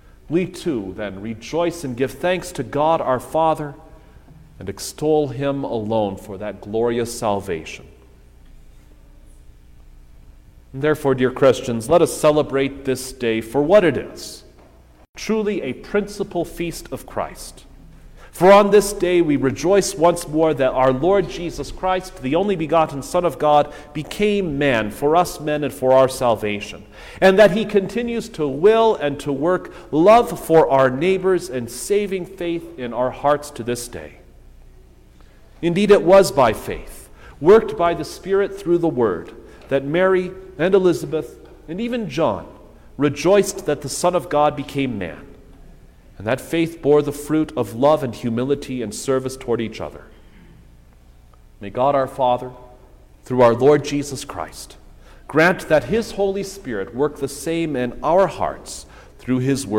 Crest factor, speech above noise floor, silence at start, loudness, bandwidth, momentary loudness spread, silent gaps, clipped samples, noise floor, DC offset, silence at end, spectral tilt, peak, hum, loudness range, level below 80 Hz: 16 dB; 29 dB; 0.3 s; -19 LUFS; 17 kHz; 15 LU; 15.09-15.13 s; under 0.1%; -48 dBFS; under 0.1%; 0 s; -5.5 dB/octave; -2 dBFS; none; 8 LU; -44 dBFS